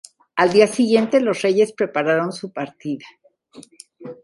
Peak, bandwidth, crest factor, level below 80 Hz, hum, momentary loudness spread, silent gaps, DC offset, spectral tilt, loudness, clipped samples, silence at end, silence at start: -2 dBFS; 11.5 kHz; 18 dB; -66 dBFS; none; 14 LU; none; under 0.1%; -5 dB/octave; -19 LUFS; under 0.1%; 0.1 s; 0.35 s